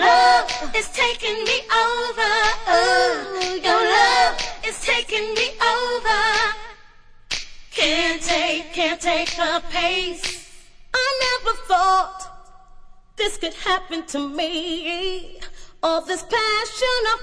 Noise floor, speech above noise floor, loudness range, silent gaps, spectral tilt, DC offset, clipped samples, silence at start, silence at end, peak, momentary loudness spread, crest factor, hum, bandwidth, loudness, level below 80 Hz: -46 dBFS; 24 dB; 6 LU; none; -1 dB/octave; under 0.1%; under 0.1%; 0 s; 0 s; -4 dBFS; 12 LU; 18 dB; none; 11 kHz; -20 LUFS; -40 dBFS